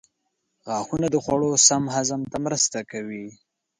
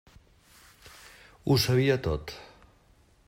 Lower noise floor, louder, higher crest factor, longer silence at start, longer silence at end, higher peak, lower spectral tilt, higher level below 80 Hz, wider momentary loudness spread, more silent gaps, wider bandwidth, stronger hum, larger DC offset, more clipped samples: first, -76 dBFS vs -61 dBFS; first, -22 LUFS vs -26 LUFS; about the same, 22 dB vs 20 dB; second, 0.65 s vs 1.45 s; second, 0.45 s vs 0.85 s; first, -4 dBFS vs -12 dBFS; second, -3 dB/octave vs -5.5 dB/octave; second, -58 dBFS vs -50 dBFS; second, 17 LU vs 26 LU; neither; second, 11 kHz vs 16 kHz; neither; neither; neither